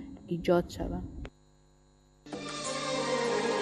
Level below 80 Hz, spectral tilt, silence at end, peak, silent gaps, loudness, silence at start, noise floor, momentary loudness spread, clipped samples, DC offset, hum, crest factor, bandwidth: -50 dBFS; -4.5 dB/octave; 0 s; -14 dBFS; none; -32 LUFS; 0 s; -62 dBFS; 16 LU; under 0.1%; under 0.1%; 50 Hz at -60 dBFS; 20 dB; 13 kHz